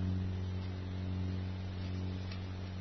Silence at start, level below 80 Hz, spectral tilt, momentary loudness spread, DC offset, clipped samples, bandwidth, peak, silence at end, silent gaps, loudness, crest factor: 0 s; -56 dBFS; -7 dB/octave; 4 LU; under 0.1%; under 0.1%; 6.2 kHz; -26 dBFS; 0 s; none; -40 LUFS; 12 dB